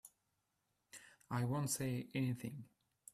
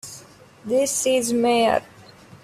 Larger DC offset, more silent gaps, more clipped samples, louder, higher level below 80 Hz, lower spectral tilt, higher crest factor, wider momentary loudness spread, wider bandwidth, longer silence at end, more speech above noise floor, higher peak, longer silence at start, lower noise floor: neither; neither; neither; second, -41 LUFS vs -20 LUFS; second, -74 dBFS vs -60 dBFS; first, -5 dB/octave vs -2.5 dB/octave; about the same, 18 dB vs 16 dB; about the same, 19 LU vs 20 LU; about the same, 15 kHz vs 15.5 kHz; first, 0.45 s vs 0.1 s; first, 45 dB vs 27 dB; second, -26 dBFS vs -6 dBFS; about the same, 0.05 s vs 0.05 s; first, -85 dBFS vs -47 dBFS